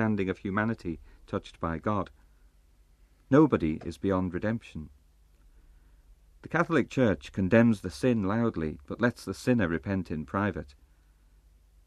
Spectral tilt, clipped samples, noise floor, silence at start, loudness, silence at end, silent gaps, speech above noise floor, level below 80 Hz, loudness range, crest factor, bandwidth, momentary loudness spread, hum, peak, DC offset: -7.5 dB/octave; under 0.1%; -61 dBFS; 0 s; -29 LUFS; 1.15 s; none; 33 dB; -52 dBFS; 5 LU; 22 dB; 12.5 kHz; 14 LU; 50 Hz at -60 dBFS; -8 dBFS; under 0.1%